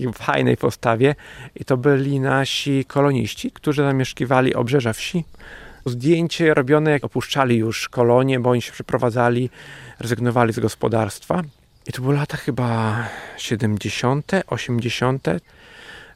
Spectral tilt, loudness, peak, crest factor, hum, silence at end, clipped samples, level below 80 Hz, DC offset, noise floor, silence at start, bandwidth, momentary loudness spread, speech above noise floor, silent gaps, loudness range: -6 dB/octave; -20 LUFS; -2 dBFS; 18 dB; none; 0.1 s; under 0.1%; -50 dBFS; under 0.1%; -41 dBFS; 0 s; 15.5 kHz; 13 LU; 22 dB; none; 4 LU